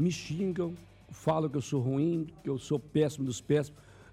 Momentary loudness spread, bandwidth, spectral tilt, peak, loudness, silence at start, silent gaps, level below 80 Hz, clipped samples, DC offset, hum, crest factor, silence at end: 8 LU; 14.5 kHz; -6.5 dB/octave; -16 dBFS; -32 LUFS; 0 s; none; -62 dBFS; under 0.1%; under 0.1%; none; 16 dB; 0 s